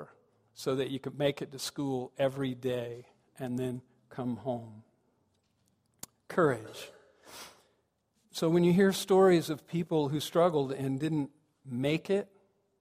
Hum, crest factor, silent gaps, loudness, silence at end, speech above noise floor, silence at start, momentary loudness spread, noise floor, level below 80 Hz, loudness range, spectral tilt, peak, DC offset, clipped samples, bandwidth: none; 20 dB; none; -31 LUFS; 0.55 s; 45 dB; 0 s; 23 LU; -75 dBFS; -70 dBFS; 10 LU; -6 dB/octave; -12 dBFS; under 0.1%; under 0.1%; 15.5 kHz